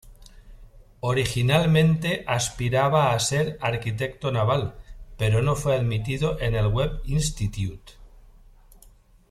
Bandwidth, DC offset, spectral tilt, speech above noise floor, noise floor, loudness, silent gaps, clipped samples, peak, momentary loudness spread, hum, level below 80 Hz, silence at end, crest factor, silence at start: 14.5 kHz; under 0.1%; -5.5 dB/octave; 30 dB; -53 dBFS; -24 LUFS; none; under 0.1%; -6 dBFS; 9 LU; none; -40 dBFS; 1.1 s; 18 dB; 0.05 s